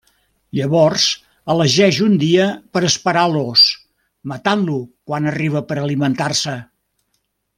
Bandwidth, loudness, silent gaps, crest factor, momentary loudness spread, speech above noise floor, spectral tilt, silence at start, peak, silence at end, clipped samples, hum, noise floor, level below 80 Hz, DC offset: 15.5 kHz; -16 LUFS; none; 16 dB; 13 LU; 53 dB; -4.5 dB/octave; 0.55 s; 0 dBFS; 0.95 s; under 0.1%; none; -69 dBFS; -58 dBFS; under 0.1%